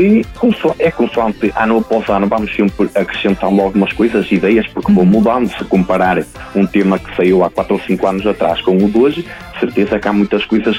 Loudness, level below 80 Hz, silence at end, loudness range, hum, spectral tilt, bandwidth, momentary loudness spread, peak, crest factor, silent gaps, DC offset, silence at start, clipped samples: -14 LUFS; -38 dBFS; 0 s; 1 LU; none; -7.5 dB/octave; 12.5 kHz; 4 LU; -2 dBFS; 12 dB; none; under 0.1%; 0 s; under 0.1%